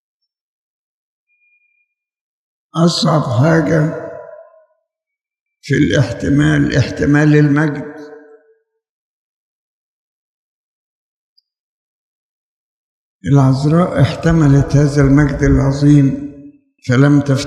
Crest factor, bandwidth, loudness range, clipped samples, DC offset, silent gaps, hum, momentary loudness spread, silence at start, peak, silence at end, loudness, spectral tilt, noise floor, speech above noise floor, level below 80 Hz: 16 dB; 10.5 kHz; 8 LU; under 0.1%; under 0.1%; 5.41-5.46 s, 8.89-11.36 s, 11.60-13.20 s; none; 15 LU; 2.75 s; 0 dBFS; 0 s; -13 LUFS; -7 dB/octave; -84 dBFS; 72 dB; -34 dBFS